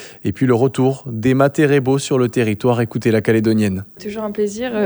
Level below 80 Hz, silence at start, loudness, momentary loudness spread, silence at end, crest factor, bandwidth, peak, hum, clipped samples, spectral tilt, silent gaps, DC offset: -52 dBFS; 0 s; -17 LUFS; 9 LU; 0 s; 16 dB; over 20 kHz; 0 dBFS; none; under 0.1%; -6.5 dB/octave; none; under 0.1%